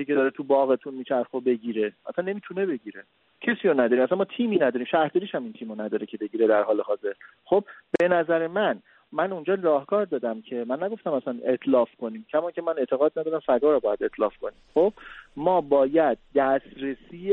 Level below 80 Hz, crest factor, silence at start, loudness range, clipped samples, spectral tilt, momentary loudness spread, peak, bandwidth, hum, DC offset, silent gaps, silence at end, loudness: -64 dBFS; 18 dB; 0 s; 3 LU; under 0.1%; -8 dB/octave; 11 LU; -8 dBFS; 4.2 kHz; none; under 0.1%; none; 0 s; -25 LUFS